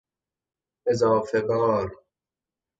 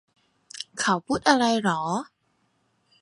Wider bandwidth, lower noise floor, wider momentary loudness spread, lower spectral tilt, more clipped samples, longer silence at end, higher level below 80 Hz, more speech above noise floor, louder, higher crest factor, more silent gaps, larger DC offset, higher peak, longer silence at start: second, 8 kHz vs 11.5 kHz; first, -90 dBFS vs -70 dBFS; second, 9 LU vs 19 LU; first, -6.5 dB/octave vs -4 dB/octave; neither; second, 0.85 s vs 1 s; about the same, -58 dBFS vs -62 dBFS; first, 67 dB vs 47 dB; about the same, -24 LUFS vs -24 LUFS; second, 18 dB vs 24 dB; neither; neither; second, -10 dBFS vs -2 dBFS; first, 0.85 s vs 0.55 s